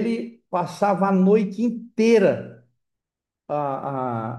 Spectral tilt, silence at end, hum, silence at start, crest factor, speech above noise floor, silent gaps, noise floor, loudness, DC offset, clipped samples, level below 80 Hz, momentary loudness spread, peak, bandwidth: -7.5 dB/octave; 0 s; none; 0 s; 16 dB; 66 dB; none; -87 dBFS; -22 LUFS; under 0.1%; under 0.1%; -72 dBFS; 12 LU; -6 dBFS; 11.5 kHz